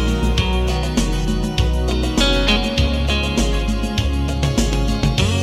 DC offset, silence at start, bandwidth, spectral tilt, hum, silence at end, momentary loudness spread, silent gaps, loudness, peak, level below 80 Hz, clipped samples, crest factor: under 0.1%; 0 s; 15 kHz; -5 dB/octave; none; 0 s; 4 LU; none; -19 LUFS; -2 dBFS; -20 dBFS; under 0.1%; 14 dB